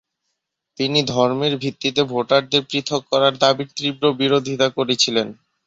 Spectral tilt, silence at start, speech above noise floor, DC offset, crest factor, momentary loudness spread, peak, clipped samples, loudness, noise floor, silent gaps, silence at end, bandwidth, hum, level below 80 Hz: -4 dB/octave; 0.8 s; 58 dB; under 0.1%; 18 dB; 6 LU; -2 dBFS; under 0.1%; -19 LUFS; -77 dBFS; none; 0.35 s; 8 kHz; none; -62 dBFS